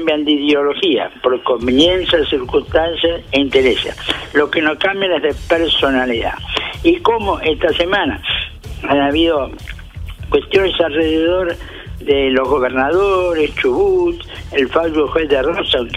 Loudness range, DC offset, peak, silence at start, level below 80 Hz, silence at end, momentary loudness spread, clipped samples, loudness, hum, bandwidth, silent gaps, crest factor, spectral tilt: 2 LU; under 0.1%; 0 dBFS; 0 s; -34 dBFS; 0 s; 7 LU; under 0.1%; -15 LUFS; none; 13.5 kHz; none; 14 dB; -5.5 dB/octave